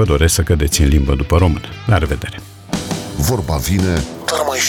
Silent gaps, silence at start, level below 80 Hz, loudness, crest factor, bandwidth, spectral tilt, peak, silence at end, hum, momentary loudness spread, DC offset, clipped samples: none; 0 s; -22 dBFS; -16 LUFS; 14 dB; 17.5 kHz; -5 dB/octave; -2 dBFS; 0 s; none; 10 LU; under 0.1%; under 0.1%